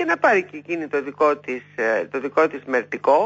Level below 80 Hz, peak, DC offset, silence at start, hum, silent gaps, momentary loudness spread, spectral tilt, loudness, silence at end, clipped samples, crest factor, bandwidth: -74 dBFS; -6 dBFS; under 0.1%; 0 s; none; none; 9 LU; -5.5 dB/octave; -22 LUFS; 0 s; under 0.1%; 16 dB; 7.8 kHz